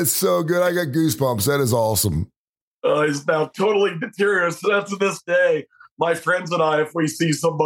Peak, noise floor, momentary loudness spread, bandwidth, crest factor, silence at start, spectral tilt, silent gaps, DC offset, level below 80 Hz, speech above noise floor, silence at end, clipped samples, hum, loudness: -4 dBFS; -53 dBFS; 4 LU; 17 kHz; 16 dB; 0 s; -4.5 dB/octave; 2.36-2.54 s, 2.61-2.82 s, 5.91-5.97 s; under 0.1%; -48 dBFS; 33 dB; 0 s; under 0.1%; none; -20 LUFS